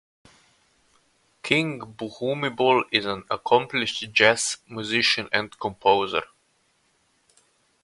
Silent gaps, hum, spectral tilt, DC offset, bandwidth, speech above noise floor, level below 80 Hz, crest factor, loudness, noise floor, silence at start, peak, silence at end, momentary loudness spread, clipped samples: none; none; -3 dB/octave; under 0.1%; 11.5 kHz; 43 dB; -62 dBFS; 24 dB; -23 LUFS; -67 dBFS; 1.45 s; 0 dBFS; 1.6 s; 12 LU; under 0.1%